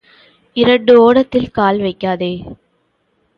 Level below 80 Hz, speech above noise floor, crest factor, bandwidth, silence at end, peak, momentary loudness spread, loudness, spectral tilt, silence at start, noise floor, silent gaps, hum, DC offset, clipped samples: -46 dBFS; 50 dB; 14 dB; 5.4 kHz; 0.85 s; 0 dBFS; 14 LU; -13 LUFS; -8 dB/octave; 0.55 s; -62 dBFS; none; none; under 0.1%; under 0.1%